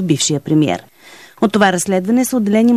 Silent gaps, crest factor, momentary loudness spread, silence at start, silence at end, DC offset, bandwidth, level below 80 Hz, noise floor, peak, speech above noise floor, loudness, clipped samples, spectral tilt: none; 14 dB; 5 LU; 0 s; 0 s; 0.2%; 14 kHz; -56 dBFS; -41 dBFS; 0 dBFS; 28 dB; -15 LUFS; under 0.1%; -4.5 dB/octave